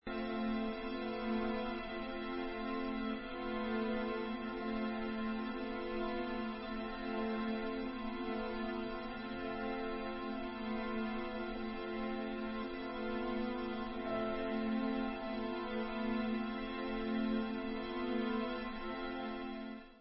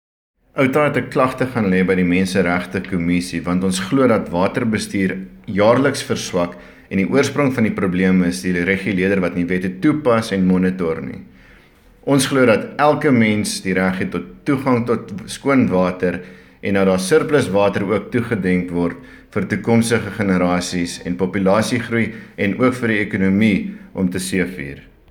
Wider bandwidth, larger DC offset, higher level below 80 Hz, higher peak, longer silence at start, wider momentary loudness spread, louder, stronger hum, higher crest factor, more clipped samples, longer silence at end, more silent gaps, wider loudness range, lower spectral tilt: second, 5.6 kHz vs 17 kHz; neither; second, -58 dBFS vs -48 dBFS; second, -26 dBFS vs 0 dBFS; second, 0.05 s vs 0.55 s; second, 5 LU vs 9 LU; second, -40 LUFS vs -18 LUFS; neither; about the same, 14 dB vs 18 dB; neither; second, 0 s vs 0.3 s; neither; about the same, 2 LU vs 2 LU; second, -3.5 dB/octave vs -6 dB/octave